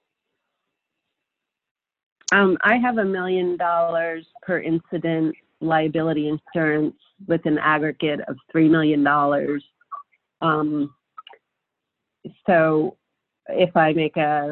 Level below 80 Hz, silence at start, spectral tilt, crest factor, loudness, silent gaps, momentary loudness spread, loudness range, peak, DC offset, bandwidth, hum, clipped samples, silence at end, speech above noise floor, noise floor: -64 dBFS; 2.3 s; -6 dB/octave; 18 dB; -21 LUFS; none; 12 LU; 3 LU; -4 dBFS; under 0.1%; 7.6 kHz; none; under 0.1%; 0 s; 63 dB; -83 dBFS